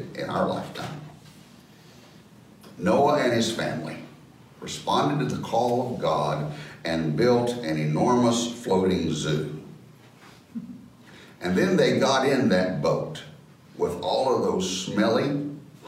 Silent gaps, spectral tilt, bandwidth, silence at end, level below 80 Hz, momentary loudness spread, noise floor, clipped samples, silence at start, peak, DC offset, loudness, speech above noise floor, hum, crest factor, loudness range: none; -5.5 dB/octave; 16 kHz; 0 s; -60 dBFS; 17 LU; -50 dBFS; under 0.1%; 0 s; -8 dBFS; under 0.1%; -25 LUFS; 27 dB; none; 16 dB; 3 LU